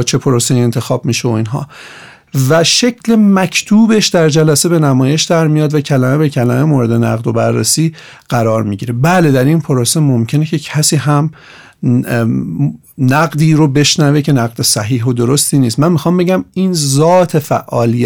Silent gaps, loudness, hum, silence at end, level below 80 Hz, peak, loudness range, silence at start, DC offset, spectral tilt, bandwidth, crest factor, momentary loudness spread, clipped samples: none; -11 LUFS; none; 0 s; -48 dBFS; -2 dBFS; 3 LU; 0 s; 0.3%; -5 dB/octave; 19 kHz; 10 dB; 7 LU; under 0.1%